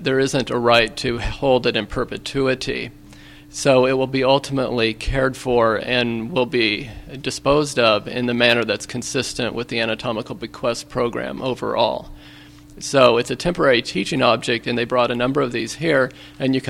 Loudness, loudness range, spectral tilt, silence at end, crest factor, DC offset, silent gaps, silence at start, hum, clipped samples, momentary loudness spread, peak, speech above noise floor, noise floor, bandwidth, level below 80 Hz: -19 LUFS; 4 LU; -4.5 dB/octave; 0 s; 20 dB; under 0.1%; none; 0 s; none; under 0.1%; 9 LU; 0 dBFS; 23 dB; -43 dBFS; 15.5 kHz; -40 dBFS